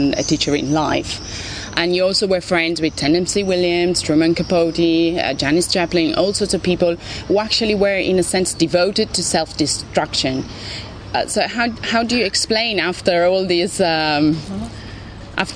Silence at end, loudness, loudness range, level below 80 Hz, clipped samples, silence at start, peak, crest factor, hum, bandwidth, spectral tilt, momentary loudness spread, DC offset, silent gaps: 0 s; -17 LUFS; 2 LU; -40 dBFS; under 0.1%; 0 s; 0 dBFS; 18 dB; none; 11 kHz; -4 dB/octave; 10 LU; under 0.1%; none